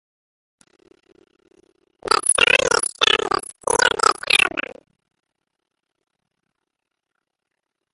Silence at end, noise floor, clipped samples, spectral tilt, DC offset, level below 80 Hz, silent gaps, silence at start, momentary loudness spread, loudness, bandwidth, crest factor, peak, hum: 3.35 s; -81 dBFS; under 0.1%; 0 dB/octave; under 0.1%; -54 dBFS; none; 2.1 s; 11 LU; -17 LUFS; 12 kHz; 22 dB; 0 dBFS; none